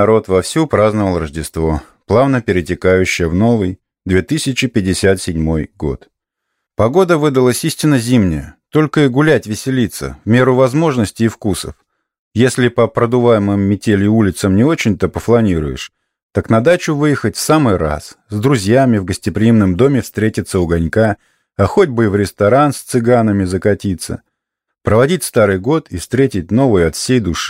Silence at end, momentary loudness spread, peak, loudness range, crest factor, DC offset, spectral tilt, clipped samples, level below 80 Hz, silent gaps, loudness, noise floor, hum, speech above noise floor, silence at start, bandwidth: 0 s; 10 LU; -2 dBFS; 2 LU; 12 dB; under 0.1%; -6 dB/octave; under 0.1%; -36 dBFS; 12.19-12.31 s, 16.23-16.30 s; -14 LUFS; -76 dBFS; none; 63 dB; 0 s; 16 kHz